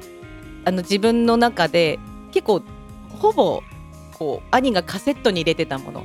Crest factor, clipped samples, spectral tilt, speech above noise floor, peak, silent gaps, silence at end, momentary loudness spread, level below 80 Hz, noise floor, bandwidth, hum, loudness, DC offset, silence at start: 20 dB; under 0.1%; -5 dB/octave; 20 dB; -2 dBFS; none; 0 s; 22 LU; -46 dBFS; -39 dBFS; 16 kHz; none; -20 LUFS; under 0.1%; 0 s